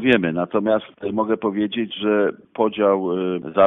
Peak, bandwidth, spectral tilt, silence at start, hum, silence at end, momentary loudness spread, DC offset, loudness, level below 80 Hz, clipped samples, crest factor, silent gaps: -4 dBFS; 4 kHz; -8.5 dB/octave; 0 s; none; 0 s; 5 LU; under 0.1%; -21 LUFS; -60 dBFS; under 0.1%; 16 dB; none